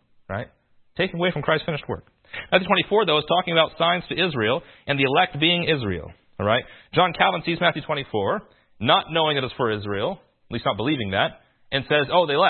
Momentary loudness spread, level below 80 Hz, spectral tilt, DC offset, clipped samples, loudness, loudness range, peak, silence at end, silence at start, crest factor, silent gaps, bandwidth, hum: 14 LU; -54 dBFS; -10 dB/octave; under 0.1%; under 0.1%; -22 LUFS; 3 LU; -2 dBFS; 0 s; 0.3 s; 22 dB; none; 4.4 kHz; none